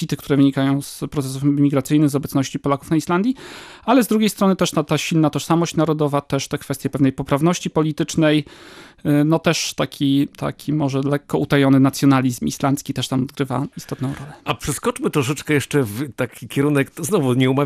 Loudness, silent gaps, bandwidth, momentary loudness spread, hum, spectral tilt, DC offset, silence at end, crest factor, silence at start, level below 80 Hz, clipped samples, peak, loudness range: -19 LUFS; none; 15.5 kHz; 9 LU; none; -6 dB/octave; under 0.1%; 0 s; 16 dB; 0 s; -50 dBFS; under 0.1%; -4 dBFS; 4 LU